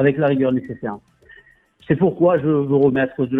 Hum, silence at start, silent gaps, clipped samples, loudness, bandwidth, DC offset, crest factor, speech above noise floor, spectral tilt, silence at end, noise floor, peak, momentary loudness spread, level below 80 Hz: none; 0 s; none; under 0.1%; -18 LUFS; 3.9 kHz; under 0.1%; 16 dB; 33 dB; -10.5 dB/octave; 0 s; -50 dBFS; -4 dBFS; 13 LU; -54 dBFS